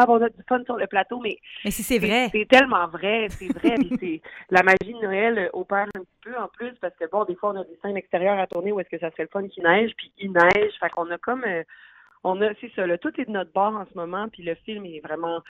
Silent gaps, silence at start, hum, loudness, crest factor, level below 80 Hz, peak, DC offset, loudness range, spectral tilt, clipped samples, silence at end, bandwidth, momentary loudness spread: none; 0 s; none; -23 LUFS; 20 dB; -54 dBFS; -4 dBFS; under 0.1%; 7 LU; -4.5 dB/octave; under 0.1%; 0.1 s; 16 kHz; 14 LU